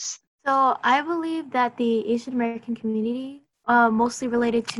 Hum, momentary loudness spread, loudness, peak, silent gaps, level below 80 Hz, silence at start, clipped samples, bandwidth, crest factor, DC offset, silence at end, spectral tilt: none; 11 LU; -23 LUFS; -8 dBFS; 0.27-0.38 s; -64 dBFS; 0 s; under 0.1%; 11.5 kHz; 16 dB; under 0.1%; 0 s; -4 dB/octave